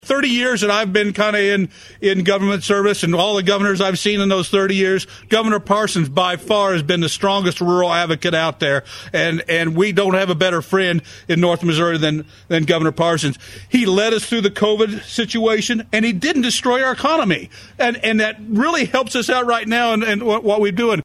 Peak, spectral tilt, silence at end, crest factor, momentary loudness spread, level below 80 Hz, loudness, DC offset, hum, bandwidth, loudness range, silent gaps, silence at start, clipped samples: -2 dBFS; -4.5 dB/octave; 0 s; 16 dB; 4 LU; -54 dBFS; -17 LUFS; under 0.1%; none; 14 kHz; 1 LU; none; 0.05 s; under 0.1%